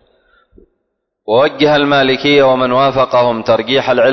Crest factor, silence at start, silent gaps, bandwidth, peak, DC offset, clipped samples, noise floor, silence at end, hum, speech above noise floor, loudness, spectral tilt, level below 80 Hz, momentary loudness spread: 12 dB; 1.25 s; none; 6.2 kHz; 0 dBFS; under 0.1%; under 0.1%; -70 dBFS; 0 s; none; 59 dB; -11 LUFS; -6 dB/octave; -48 dBFS; 3 LU